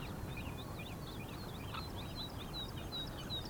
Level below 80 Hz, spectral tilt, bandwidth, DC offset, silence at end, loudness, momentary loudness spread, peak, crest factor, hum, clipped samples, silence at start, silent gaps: -52 dBFS; -5 dB/octave; over 20 kHz; under 0.1%; 0 s; -44 LUFS; 3 LU; -30 dBFS; 14 dB; none; under 0.1%; 0 s; none